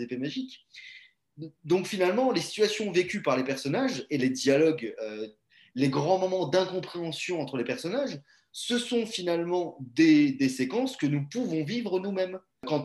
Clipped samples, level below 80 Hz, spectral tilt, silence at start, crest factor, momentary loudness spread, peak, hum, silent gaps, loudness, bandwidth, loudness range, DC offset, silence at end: under 0.1%; -74 dBFS; -5 dB/octave; 0 s; 18 dB; 16 LU; -10 dBFS; none; none; -28 LUFS; 12.5 kHz; 3 LU; under 0.1%; 0 s